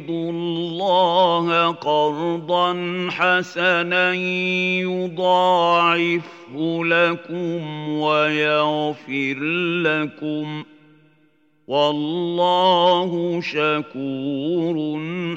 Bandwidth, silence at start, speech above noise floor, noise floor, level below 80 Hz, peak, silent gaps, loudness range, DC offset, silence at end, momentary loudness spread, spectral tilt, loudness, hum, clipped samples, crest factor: 8 kHz; 0 s; 40 dB; -60 dBFS; -80 dBFS; -4 dBFS; none; 4 LU; under 0.1%; 0 s; 10 LU; -6 dB/octave; -20 LUFS; none; under 0.1%; 16 dB